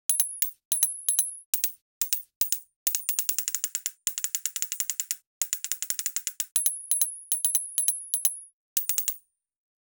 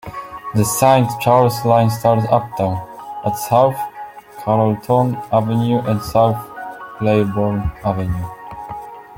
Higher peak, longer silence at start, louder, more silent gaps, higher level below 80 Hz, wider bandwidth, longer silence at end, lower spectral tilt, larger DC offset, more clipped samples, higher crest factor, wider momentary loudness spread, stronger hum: second, -4 dBFS vs 0 dBFS; about the same, 0.1 s vs 0.05 s; second, -26 LUFS vs -17 LUFS; first, 0.65-0.71 s, 1.46-1.53 s, 1.81-2.01 s, 2.36-2.41 s, 2.76-2.86 s, 5.27-5.41 s, 8.53-8.76 s vs none; second, -78 dBFS vs -42 dBFS; first, over 20 kHz vs 17 kHz; first, 0.8 s vs 0 s; second, 4.5 dB/octave vs -6.5 dB/octave; neither; neither; first, 26 dB vs 16 dB; second, 6 LU vs 17 LU; neither